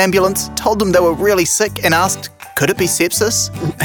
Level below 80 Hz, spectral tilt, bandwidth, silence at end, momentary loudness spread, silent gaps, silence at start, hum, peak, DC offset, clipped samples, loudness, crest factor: -40 dBFS; -3.5 dB/octave; over 20 kHz; 0 s; 5 LU; none; 0 s; none; -2 dBFS; under 0.1%; under 0.1%; -14 LUFS; 12 dB